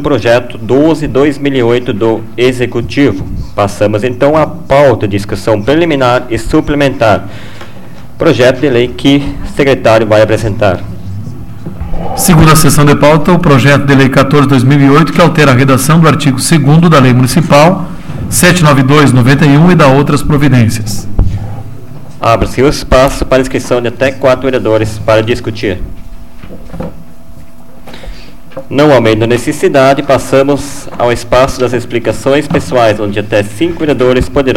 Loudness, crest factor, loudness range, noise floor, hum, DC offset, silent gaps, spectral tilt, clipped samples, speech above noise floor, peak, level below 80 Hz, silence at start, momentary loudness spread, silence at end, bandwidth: -8 LUFS; 8 dB; 6 LU; -34 dBFS; none; 7%; none; -6 dB/octave; 0.6%; 26 dB; 0 dBFS; -26 dBFS; 0 s; 14 LU; 0 s; 17 kHz